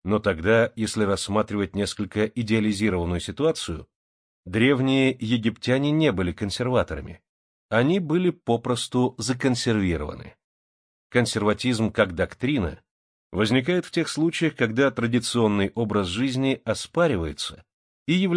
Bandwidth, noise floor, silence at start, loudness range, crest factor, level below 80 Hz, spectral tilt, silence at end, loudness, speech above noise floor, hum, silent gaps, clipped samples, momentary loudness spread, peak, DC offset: 10.5 kHz; under -90 dBFS; 0.05 s; 2 LU; 18 dB; -48 dBFS; -5.5 dB/octave; 0 s; -24 LUFS; over 67 dB; none; 3.96-4.43 s, 7.29-7.69 s, 10.44-11.10 s, 12.91-13.30 s, 17.74-18.06 s; under 0.1%; 7 LU; -6 dBFS; under 0.1%